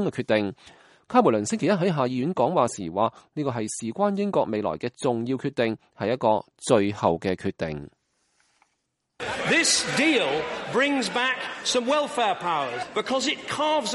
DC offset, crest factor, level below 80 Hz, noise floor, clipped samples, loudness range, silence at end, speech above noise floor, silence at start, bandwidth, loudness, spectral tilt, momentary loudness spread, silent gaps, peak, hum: under 0.1%; 20 dB; -62 dBFS; -77 dBFS; under 0.1%; 4 LU; 0 s; 52 dB; 0 s; 11.5 kHz; -24 LUFS; -4 dB/octave; 9 LU; none; -4 dBFS; none